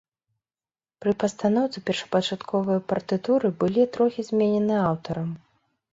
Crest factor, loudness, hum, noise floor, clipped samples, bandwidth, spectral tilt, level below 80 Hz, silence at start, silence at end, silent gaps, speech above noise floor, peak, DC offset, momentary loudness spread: 16 dB; -25 LUFS; none; under -90 dBFS; under 0.1%; 7.8 kHz; -6.5 dB/octave; -62 dBFS; 1 s; 0.55 s; none; over 66 dB; -8 dBFS; under 0.1%; 7 LU